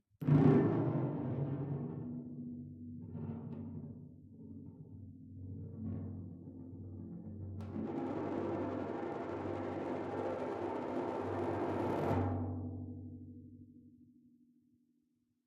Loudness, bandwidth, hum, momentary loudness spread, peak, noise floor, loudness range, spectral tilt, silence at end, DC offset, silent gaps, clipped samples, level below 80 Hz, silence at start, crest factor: -38 LUFS; 7.4 kHz; none; 18 LU; -16 dBFS; -79 dBFS; 10 LU; -10 dB/octave; 1.45 s; under 0.1%; none; under 0.1%; -70 dBFS; 0.2 s; 22 dB